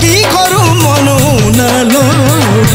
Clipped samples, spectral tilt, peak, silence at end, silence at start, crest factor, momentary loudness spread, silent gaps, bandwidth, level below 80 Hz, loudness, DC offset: under 0.1%; -4.5 dB/octave; 0 dBFS; 0 s; 0 s; 8 dB; 1 LU; none; 16.5 kHz; -28 dBFS; -8 LUFS; under 0.1%